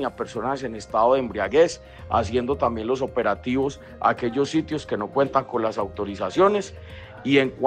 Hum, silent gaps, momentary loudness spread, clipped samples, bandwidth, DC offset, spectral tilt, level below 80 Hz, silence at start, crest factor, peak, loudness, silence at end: none; none; 9 LU; under 0.1%; 9.6 kHz; under 0.1%; -5.5 dB/octave; -48 dBFS; 0 s; 18 dB; -4 dBFS; -23 LUFS; 0 s